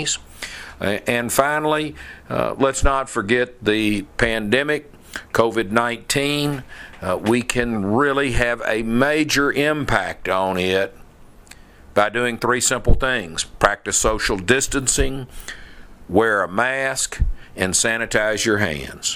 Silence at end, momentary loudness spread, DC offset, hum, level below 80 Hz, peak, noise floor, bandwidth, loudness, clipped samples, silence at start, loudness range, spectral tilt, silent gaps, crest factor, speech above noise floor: 0 s; 9 LU; under 0.1%; none; -32 dBFS; 0 dBFS; -44 dBFS; 16 kHz; -20 LUFS; under 0.1%; 0 s; 2 LU; -3.5 dB/octave; none; 20 dB; 24 dB